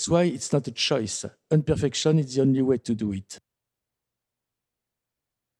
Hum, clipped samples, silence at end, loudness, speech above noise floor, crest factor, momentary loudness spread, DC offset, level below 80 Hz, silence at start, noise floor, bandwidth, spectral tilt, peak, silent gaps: none; under 0.1%; 2.2 s; -24 LUFS; 62 dB; 18 dB; 10 LU; under 0.1%; -54 dBFS; 0 s; -86 dBFS; 11.5 kHz; -5.5 dB/octave; -8 dBFS; none